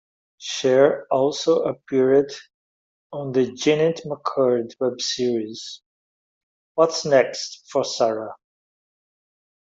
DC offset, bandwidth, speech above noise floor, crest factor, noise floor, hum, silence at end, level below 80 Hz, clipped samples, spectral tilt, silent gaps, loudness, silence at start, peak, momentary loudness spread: under 0.1%; 7.8 kHz; over 69 dB; 18 dB; under -90 dBFS; none; 1.35 s; -68 dBFS; under 0.1%; -4.5 dB/octave; 2.54-3.10 s, 5.86-6.75 s; -21 LUFS; 0.4 s; -4 dBFS; 15 LU